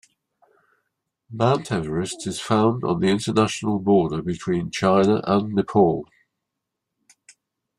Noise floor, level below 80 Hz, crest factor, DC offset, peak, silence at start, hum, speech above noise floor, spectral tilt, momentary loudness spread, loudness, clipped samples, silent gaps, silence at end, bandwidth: -82 dBFS; -56 dBFS; 18 dB; under 0.1%; -4 dBFS; 1.3 s; none; 61 dB; -6 dB/octave; 8 LU; -21 LUFS; under 0.1%; none; 1.75 s; 12 kHz